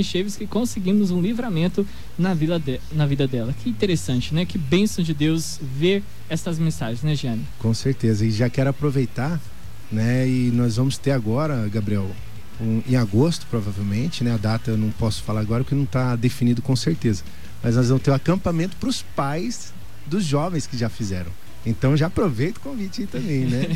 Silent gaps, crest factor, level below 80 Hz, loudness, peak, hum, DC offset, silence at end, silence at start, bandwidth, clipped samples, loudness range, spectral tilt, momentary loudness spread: none; 16 dB; -44 dBFS; -23 LUFS; -8 dBFS; none; 3%; 0 s; 0 s; 16 kHz; under 0.1%; 2 LU; -6.5 dB/octave; 9 LU